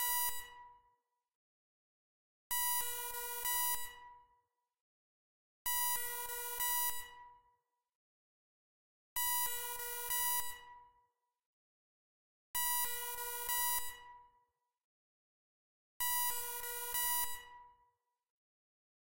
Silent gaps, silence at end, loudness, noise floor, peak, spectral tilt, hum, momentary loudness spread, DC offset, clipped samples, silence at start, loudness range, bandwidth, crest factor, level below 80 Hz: 1.35-2.50 s, 4.81-5.65 s, 7.95-9.16 s, 11.46-12.54 s, 14.84-16.00 s, 18.30-18.38 s; 0.65 s; -36 LUFS; -79 dBFS; -20 dBFS; 2.5 dB/octave; none; 14 LU; under 0.1%; under 0.1%; 0 s; 2 LU; 16 kHz; 22 dB; -68 dBFS